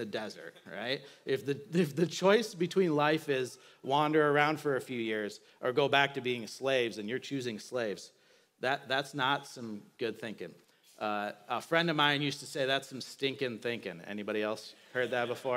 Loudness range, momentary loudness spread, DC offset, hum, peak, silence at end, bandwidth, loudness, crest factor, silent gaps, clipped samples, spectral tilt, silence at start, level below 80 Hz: 6 LU; 14 LU; under 0.1%; none; -12 dBFS; 0 s; 16 kHz; -32 LUFS; 20 dB; none; under 0.1%; -4.5 dB/octave; 0 s; -88 dBFS